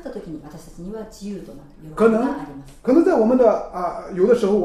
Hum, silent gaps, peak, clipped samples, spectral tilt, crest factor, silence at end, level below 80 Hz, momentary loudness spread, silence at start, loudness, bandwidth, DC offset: none; none; -4 dBFS; under 0.1%; -7.5 dB/octave; 16 dB; 0 s; -46 dBFS; 20 LU; 0.05 s; -18 LUFS; 13 kHz; under 0.1%